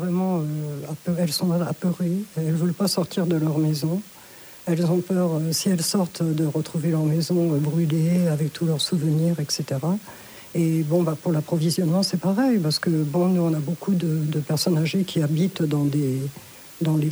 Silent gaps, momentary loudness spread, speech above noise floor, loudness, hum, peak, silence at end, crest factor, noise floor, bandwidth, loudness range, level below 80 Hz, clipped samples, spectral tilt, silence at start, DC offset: none; 7 LU; 22 dB; -23 LUFS; none; -10 dBFS; 0 s; 12 dB; -44 dBFS; over 20 kHz; 2 LU; -64 dBFS; under 0.1%; -6 dB/octave; 0 s; under 0.1%